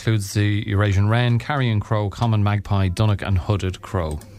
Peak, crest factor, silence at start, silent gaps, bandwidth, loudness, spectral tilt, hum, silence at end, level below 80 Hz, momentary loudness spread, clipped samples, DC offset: -6 dBFS; 14 dB; 0 s; none; 14 kHz; -21 LUFS; -6.5 dB/octave; none; 0 s; -38 dBFS; 6 LU; under 0.1%; under 0.1%